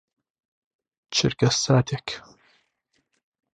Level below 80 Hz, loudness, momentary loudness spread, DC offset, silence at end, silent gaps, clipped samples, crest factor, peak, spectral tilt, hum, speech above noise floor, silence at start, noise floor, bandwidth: -56 dBFS; -23 LUFS; 14 LU; under 0.1%; 1.35 s; none; under 0.1%; 22 dB; -6 dBFS; -4.5 dB/octave; none; 50 dB; 1.1 s; -73 dBFS; 10 kHz